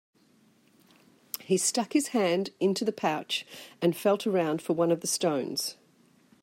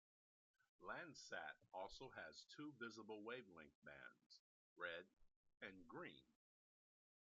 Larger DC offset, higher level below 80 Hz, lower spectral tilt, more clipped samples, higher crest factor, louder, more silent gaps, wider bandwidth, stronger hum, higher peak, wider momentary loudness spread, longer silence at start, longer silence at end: neither; about the same, -80 dBFS vs -84 dBFS; first, -4 dB/octave vs -2 dB/octave; neither; about the same, 20 dB vs 22 dB; first, -28 LUFS vs -57 LUFS; second, none vs 3.75-3.82 s, 4.26-4.30 s, 4.39-4.76 s, 5.36-5.44 s; first, 16 kHz vs 7.4 kHz; neither; first, -10 dBFS vs -38 dBFS; about the same, 7 LU vs 9 LU; first, 1.4 s vs 0.8 s; second, 0.7 s vs 1.05 s